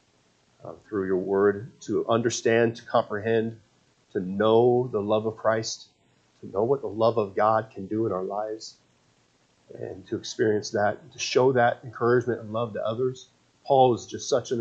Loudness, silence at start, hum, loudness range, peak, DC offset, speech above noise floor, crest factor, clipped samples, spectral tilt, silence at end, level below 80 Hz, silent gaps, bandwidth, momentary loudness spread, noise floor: -25 LUFS; 0.65 s; none; 5 LU; -6 dBFS; under 0.1%; 40 dB; 20 dB; under 0.1%; -5.5 dB/octave; 0 s; -68 dBFS; none; 8.2 kHz; 14 LU; -65 dBFS